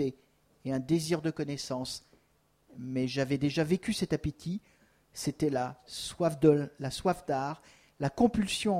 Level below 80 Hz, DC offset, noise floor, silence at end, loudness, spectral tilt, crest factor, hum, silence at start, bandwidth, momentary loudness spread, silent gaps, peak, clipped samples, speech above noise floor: -56 dBFS; under 0.1%; -70 dBFS; 0 s; -31 LUFS; -5.5 dB/octave; 20 dB; none; 0 s; 16 kHz; 12 LU; none; -10 dBFS; under 0.1%; 39 dB